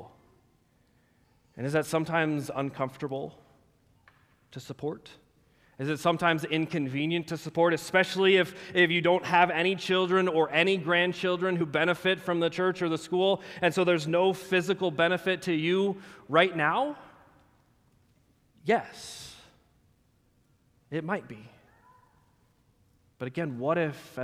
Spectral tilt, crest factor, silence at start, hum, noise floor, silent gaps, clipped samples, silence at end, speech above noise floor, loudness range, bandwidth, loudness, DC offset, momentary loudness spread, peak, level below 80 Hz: -5.5 dB/octave; 22 dB; 0 s; none; -67 dBFS; none; under 0.1%; 0 s; 40 dB; 14 LU; 15 kHz; -27 LUFS; under 0.1%; 14 LU; -8 dBFS; -70 dBFS